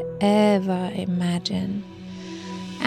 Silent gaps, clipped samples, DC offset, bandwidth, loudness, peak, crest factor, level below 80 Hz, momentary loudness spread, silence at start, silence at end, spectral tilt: none; under 0.1%; under 0.1%; 13 kHz; -23 LUFS; -6 dBFS; 18 dB; -58 dBFS; 17 LU; 0 s; 0 s; -6.5 dB/octave